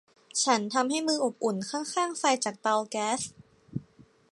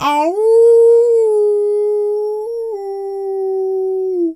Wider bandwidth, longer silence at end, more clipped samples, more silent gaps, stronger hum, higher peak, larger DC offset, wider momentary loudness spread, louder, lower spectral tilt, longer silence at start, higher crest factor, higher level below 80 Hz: about the same, 11.5 kHz vs 11.5 kHz; first, 0.3 s vs 0 s; neither; neither; neither; second, -10 dBFS vs -2 dBFS; neither; about the same, 14 LU vs 14 LU; second, -28 LUFS vs -14 LUFS; second, -3 dB/octave vs -4.5 dB/octave; first, 0.35 s vs 0 s; first, 20 dB vs 10 dB; second, -72 dBFS vs -64 dBFS